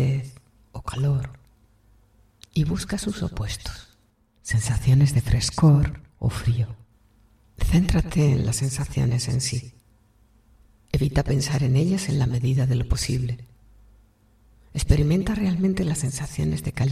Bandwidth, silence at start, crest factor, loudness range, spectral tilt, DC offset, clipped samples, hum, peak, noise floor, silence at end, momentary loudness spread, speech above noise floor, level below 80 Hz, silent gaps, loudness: 14.5 kHz; 0 s; 22 dB; 7 LU; -6 dB/octave; under 0.1%; under 0.1%; none; -2 dBFS; -62 dBFS; 0 s; 12 LU; 40 dB; -34 dBFS; none; -23 LUFS